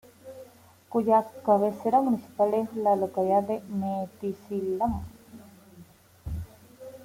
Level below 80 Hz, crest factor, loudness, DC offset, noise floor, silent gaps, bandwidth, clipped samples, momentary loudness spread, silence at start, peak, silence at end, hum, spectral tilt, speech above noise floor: -52 dBFS; 18 dB; -27 LUFS; under 0.1%; -53 dBFS; none; 16.5 kHz; under 0.1%; 22 LU; 0.25 s; -10 dBFS; 0 s; none; -8.5 dB/octave; 27 dB